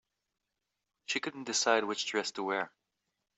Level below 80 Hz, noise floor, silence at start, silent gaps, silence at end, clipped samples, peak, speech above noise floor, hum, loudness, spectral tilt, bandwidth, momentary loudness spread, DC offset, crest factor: -84 dBFS; -87 dBFS; 1.1 s; none; 0.7 s; under 0.1%; -12 dBFS; 54 dB; none; -32 LUFS; -1.5 dB/octave; 8.2 kHz; 9 LU; under 0.1%; 24 dB